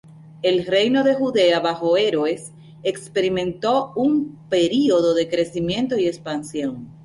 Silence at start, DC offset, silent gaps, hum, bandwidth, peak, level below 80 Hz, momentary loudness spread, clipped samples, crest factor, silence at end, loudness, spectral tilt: 0.15 s; under 0.1%; none; none; 11.5 kHz; -6 dBFS; -56 dBFS; 10 LU; under 0.1%; 14 dB; 0.15 s; -20 LUFS; -5 dB/octave